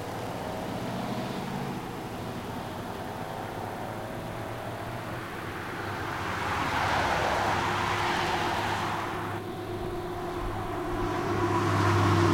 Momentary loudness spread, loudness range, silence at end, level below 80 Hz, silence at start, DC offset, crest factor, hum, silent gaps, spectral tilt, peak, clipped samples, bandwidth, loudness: 10 LU; 8 LU; 0 s; -48 dBFS; 0 s; under 0.1%; 18 dB; none; none; -5.5 dB/octave; -12 dBFS; under 0.1%; 16.5 kHz; -31 LUFS